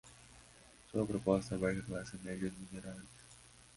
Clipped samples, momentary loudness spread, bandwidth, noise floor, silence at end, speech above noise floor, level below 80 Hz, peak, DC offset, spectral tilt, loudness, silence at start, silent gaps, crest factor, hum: under 0.1%; 24 LU; 11.5 kHz; -61 dBFS; 0.15 s; 23 dB; -62 dBFS; -18 dBFS; under 0.1%; -6.5 dB/octave; -39 LUFS; 0.05 s; none; 24 dB; none